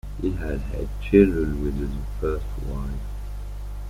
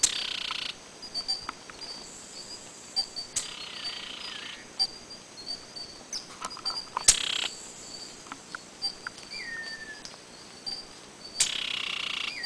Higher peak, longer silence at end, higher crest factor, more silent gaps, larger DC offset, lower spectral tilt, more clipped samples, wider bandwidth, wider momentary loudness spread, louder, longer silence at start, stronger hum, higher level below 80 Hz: about the same, -4 dBFS vs -4 dBFS; about the same, 0 s vs 0 s; second, 22 dB vs 30 dB; neither; neither; first, -8.5 dB/octave vs 1 dB/octave; neither; first, 15 kHz vs 11 kHz; about the same, 18 LU vs 16 LU; first, -25 LUFS vs -31 LUFS; about the same, 0.05 s vs 0 s; first, 50 Hz at -30 dBFS vs none; first, -30 dBFS vs -58 dBFS